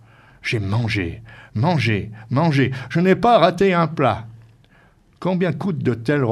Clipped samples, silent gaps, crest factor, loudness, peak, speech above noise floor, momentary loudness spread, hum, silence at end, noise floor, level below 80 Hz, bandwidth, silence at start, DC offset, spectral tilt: under 0.1%; none; 20 dB; -19 LUFS; 0 dBFS; 35 dB; 13 LU; none; 0 s; -53 dBFS; -50 dBFS; 11.5 kHz; 0.45 s; under 0.1%; -7.5 dB/octave